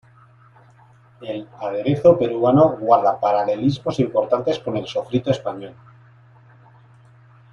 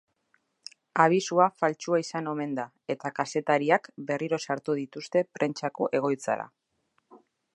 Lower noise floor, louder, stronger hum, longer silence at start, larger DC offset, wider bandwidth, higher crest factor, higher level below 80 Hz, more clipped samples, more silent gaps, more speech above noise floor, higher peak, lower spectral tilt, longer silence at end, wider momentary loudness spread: second, -51 dBFS vs -74 dBFS; first, -19 LUFS vs -28 LUFS; neither; first, 1.2 s vs 0.95 s; neither; second, 7.4 kHz vs 11.5 kHz; second, 18 dB vs 24 dB; first, -58 dBFS vs -82 dBFS; neither; neither; second, 32 dB vs 47 dB; first, -2 dBFS vs -6 dBFS; first, -8 dB/octave vs -5 dB/octave; first, 1.8 s vs 0.4 s; first, 16 LU vs 11 LU